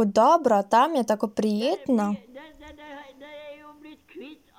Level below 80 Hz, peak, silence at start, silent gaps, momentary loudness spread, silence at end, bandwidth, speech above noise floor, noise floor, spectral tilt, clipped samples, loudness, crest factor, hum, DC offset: -64 dBFS; -8 dBFS; 0 s; none; 25 LU; 0.25 s; 16 kHz; 26 dB; -48 dBFS; -5.5 dB/octave; under 0.1%; -23 LUFS; 18 dB; none; under 0.1%